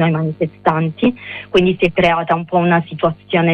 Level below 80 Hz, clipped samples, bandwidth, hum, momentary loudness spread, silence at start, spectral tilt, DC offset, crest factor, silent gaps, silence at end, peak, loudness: -44 dBFS; under 0.1%; 6.6 kHz; none; 6 LU; 0 s; -8 dB/octave; under 0.1%; 14 dB; none; 0 s; -2 dBFS; -16 LUFS